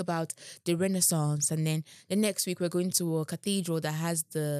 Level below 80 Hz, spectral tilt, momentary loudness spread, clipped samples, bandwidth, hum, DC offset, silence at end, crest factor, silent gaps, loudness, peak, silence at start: -86 dBFS; -4.5 dB/octave; 8 LU; under 0.1%; 16 kHz; none; under 0.1%; 0 s; 18 dB; none; -29 LUFS; -12 dBFS; 0 s